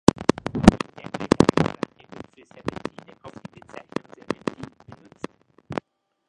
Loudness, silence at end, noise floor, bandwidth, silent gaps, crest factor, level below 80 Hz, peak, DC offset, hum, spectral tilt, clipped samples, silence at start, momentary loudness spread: -24 LUFS; 0.55 s; -49 dBFS; 11.5 kHz; none; 26 dB; -42 dBFS; 0 dBFS; under 0.1%; none; -6 dB/octave; under 0.1%; 0.2 s; 25 LU